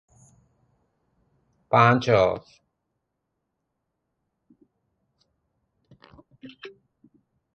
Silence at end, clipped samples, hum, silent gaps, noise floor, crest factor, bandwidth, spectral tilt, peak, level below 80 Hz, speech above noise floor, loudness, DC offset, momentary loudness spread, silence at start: 0.85 s; under 0.1%; none; none; -80 dBFS; 26 dB; 7.6 kHz; -7 dB/octave; -4 dBFS; -60 dBFS; 59 dB; -21 LUFS; under 0.1%; 27 LU; 1.7 s